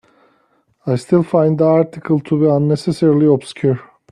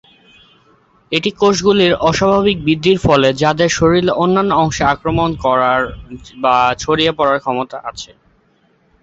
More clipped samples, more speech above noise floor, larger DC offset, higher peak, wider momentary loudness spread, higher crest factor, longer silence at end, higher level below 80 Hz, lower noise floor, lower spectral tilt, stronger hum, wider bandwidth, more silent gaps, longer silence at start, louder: neither; about the same, 45 dB vs 42 dB; neither; about the same, -2 dBFS vs 0 dBFS; second, 8 LU vs 11 LU; about the same, 14 dB vs 14 dB; second, 0.3 s vs 1 s; second, -56 dBFS vs -38 dBFS; about the same, -59 dBFS vs -56 dBFS; first, -8.5 dB/octave vs -5 dB/octave; neither; first, 11 kHz vs 8 kHz; neither; second, 0.85 s vs 1.1 s; about the same, -15 LUFS vs -14 LUFS